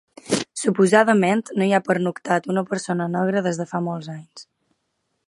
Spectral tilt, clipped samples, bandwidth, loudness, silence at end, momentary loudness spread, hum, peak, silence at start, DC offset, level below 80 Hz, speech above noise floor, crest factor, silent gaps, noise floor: -5.5 dB/octave; under 0.1%; 11.5 kHz; -21 LUFS; 0.85 s; 11 LU; none; -2 dBFS; 0.25 s; under 0.1%; -68 dBFS; 53 dB; 20 dB; none; -74 dBFS